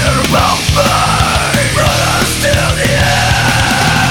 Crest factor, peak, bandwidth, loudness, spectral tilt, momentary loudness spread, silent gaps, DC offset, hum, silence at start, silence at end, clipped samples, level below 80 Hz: 10 dB; 0 dBFS; over 20 kHz; -10 LUFS; -3.5 dB/octave; 1 LU; none; under 0.1%; none; 0 s; 0 s; under 0.1%; -22 dBFS